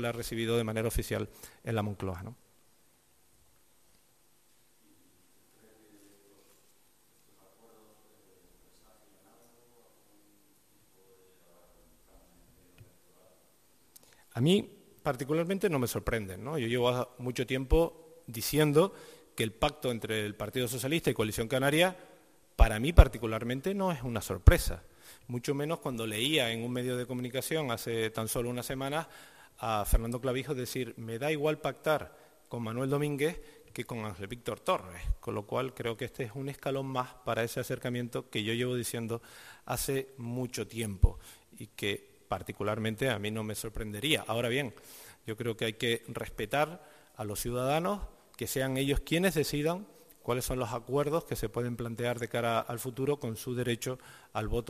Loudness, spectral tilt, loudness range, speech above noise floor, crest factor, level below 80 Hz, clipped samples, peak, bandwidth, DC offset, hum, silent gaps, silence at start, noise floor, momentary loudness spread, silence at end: -32 LUFS; -5 dB/octave; 7 LU; 37 dB; 30 dB; -40 dBFS; under 0.1%; -4 dBFS; 15 kHz; under 0.1%; none; none; 0 s; -68 dBFS; 12 LU; 0 s